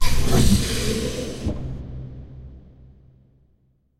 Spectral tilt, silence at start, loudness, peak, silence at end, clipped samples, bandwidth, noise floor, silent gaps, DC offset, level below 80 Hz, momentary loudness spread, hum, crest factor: -5 dB/octave; 0 s; -23 LUFS; -4 dBFS; 1.4 s; under 0.1%; 15 kHz; -63 dBFS; none; under 0.1%; -28 dBFS; 22 LU; none; 18 dB